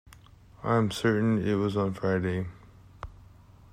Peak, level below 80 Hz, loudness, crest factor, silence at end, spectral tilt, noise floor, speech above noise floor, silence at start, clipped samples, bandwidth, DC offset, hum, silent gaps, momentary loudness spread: -12 dBFS; -54 dBFS; -28 LUFS; 16 dB; 0.55 s; -7 dB/octave; -53 dBFS; 27 dB; 0.1 s; under 0.1%; 15 kHz; under 0.1%; none; none; 21 LU